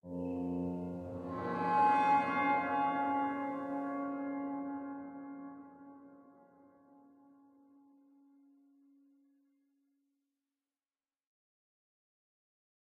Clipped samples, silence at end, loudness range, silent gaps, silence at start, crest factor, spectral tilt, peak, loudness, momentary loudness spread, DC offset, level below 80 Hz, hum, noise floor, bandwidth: under 0.1%; 6.7 s; 20 LU; none; 0.05 s; 20 dB; -7.5 dB/octave; -20 dBFS; -35 LUFS; 20 LU; under 0.1%; -74 dBFS; none; under -90 dBFS; 9 kHz